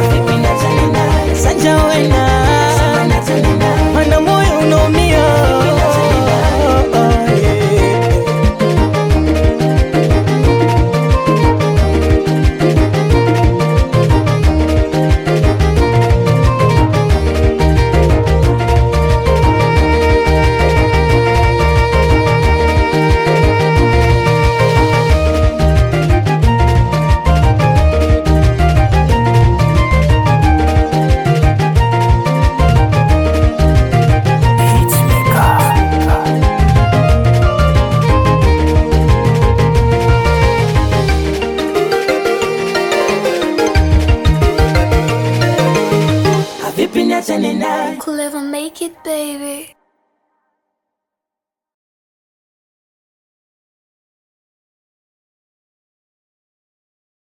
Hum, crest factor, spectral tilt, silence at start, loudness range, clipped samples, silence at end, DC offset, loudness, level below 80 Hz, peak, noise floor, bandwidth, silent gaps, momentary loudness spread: none; 10 dB; -6.5 dB/octave; 0 s; 3 LU; under 0.1%; 7.65 s; under 0.1%; -12 LUFS; -18 dBFS; 0 dBFS; -85 dBFS; 17.5 kHz; none; 4 LU